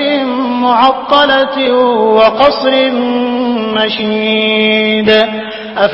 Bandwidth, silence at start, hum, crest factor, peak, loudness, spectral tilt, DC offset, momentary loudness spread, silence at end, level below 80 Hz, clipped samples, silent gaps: 8 kHz; 0 s; none; 10 dB; 0 dBFS; -10 LUFS; -6.5 dB/octave; under 0.1%; 6 LU; 0 s; -48 dBFS; 0.2%; none